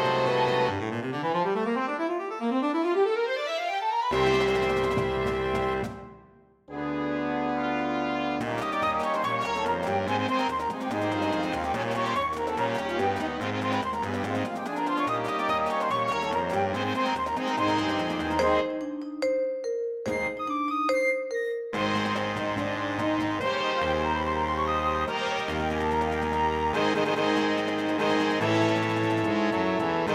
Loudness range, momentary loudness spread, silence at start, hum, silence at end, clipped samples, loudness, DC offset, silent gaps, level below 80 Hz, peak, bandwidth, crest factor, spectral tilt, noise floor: 3 LU; 5 LU; 0 s; none; 0 s; under 0.1%; -27 LUFS; under 0.1%; none; -50 dBFS; -10 dBFS; 15.5 kHz; 16 dB; -5.5 dB/octave; -56 dBFS